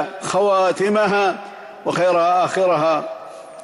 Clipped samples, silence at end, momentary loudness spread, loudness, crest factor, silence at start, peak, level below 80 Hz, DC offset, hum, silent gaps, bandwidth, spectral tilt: under 0.1%; 0 s; 15 LU; -18 LUFS; 12 dB; 0 s; -6 dBFS; -68 dBFS; under 0.1%; none; none; 12 kHz; -4.5 dB/octave